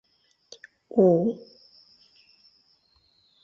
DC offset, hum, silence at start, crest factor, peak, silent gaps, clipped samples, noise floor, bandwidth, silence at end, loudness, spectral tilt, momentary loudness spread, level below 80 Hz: under 0.1%; none; 0.95 s; 20 dB; -8 dBFS; none; under 0.1%; -65 dBFS; 6.8 kHz; 2.05 s; -23 LUFS; -9 dB/octave; 28 LU; -72 dBFS